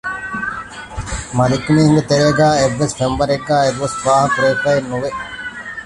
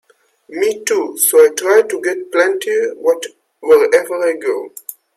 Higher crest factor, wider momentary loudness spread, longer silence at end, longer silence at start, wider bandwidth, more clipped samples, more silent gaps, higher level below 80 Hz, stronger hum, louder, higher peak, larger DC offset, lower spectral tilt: about the same, 14 dB vs 14 dB; about the same, 14 LU vs 15 LU; second, 0 s vs 0.25 s; second, 0.05 s vs 0.5 s; second, 11.5 kHz vs 16 kHz; neither; neither; first, -38 dBFS vs -68 dBFS; neither; about the same, -16 LUFS vs -14 LUFS; about the same, -2 dBFS vs 0 dBFS; neither; first, -5.5 dB/octave vs -1 dB/octave